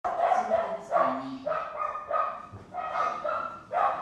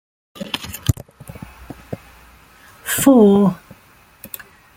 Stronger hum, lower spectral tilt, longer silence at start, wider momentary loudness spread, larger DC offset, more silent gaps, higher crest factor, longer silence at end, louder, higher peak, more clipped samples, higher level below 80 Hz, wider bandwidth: neither; about the same, -5 dB/octave vs -5.5 dB/octave; second, 0.05 s vs 0.4 s; second, 8 LU vs 26 LU; neither; neither; about the same, 18 dB vs 18 dB; second, 0 s vs 1.2 s; second, -29 LUFS vs -16 LUFS; second, -12 dBFS vs -2 dBFS; neither; second, -66 dBFS vs -44 dBFS; second, 10 kHz vs 16.5 kHz